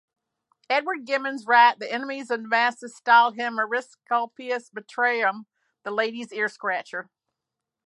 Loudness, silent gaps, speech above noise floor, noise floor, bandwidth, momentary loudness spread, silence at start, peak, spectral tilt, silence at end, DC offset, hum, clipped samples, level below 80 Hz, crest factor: -24 LUFS; none; 62 dB; -86 dBFS; 11 kHz; 13 LU; 0.7 s; -6 dBFS; -3 dB/octave; 0.85 s; under 0.1%; none; under 0.1%; -88 dBFS; 20 dB